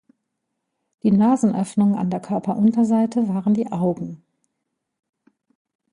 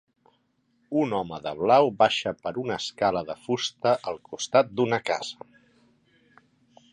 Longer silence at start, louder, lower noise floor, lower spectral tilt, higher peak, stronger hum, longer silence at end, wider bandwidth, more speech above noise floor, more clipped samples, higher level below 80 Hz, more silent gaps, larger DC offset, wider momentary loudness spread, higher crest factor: first, 1.05 s vs 0.9 s; first, -20 LUFS vs -25 LUFS; first, -78 dBFS vs -69 dBFS; first, -8.5 dB/octave vs -4.5 dB/octave; about the same, -6 dBFS vs -6 dBFS; neither; first, 1.75 s vs 1.6 s; about the same, 11 kHz vs 11 kHz; first, 59 dB vs 44 dB; neither; about the same, -62 dBFS vs -64 dBFS; neither; neither; second, 8 LU vs 12 LU; second, 14 dB vs 22 dB